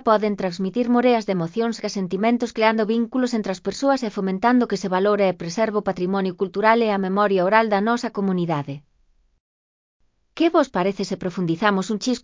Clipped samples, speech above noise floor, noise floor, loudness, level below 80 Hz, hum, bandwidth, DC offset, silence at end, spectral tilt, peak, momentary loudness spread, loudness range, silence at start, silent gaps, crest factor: under 0.1%; 40 dB; -61 dBFS; -21 LUFS; -60 dBFS; none; 7.6 kHz; under 0.1%; 0.05 s; -6 dB/octave; -2 dBFS; 7 LU; 4 LU; 0.05 s; 9.40-10.00 s; 18 dB